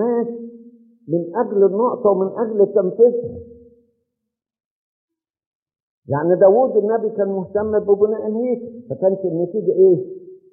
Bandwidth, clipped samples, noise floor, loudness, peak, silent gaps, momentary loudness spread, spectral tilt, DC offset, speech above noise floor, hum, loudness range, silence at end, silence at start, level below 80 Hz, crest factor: 2.4 kHz; under 0.1%; -81 dBFS; -18 LUFS; -2 dBFS; 4.65-5.08 s, 5.46-5.66 s, 5.82-6.02 s; 13 LU; -6 dB/octave; under 0.1%; 64 dB; none; 5 LU; 0.15 s; 0 s; -60 dBFS; 16 dB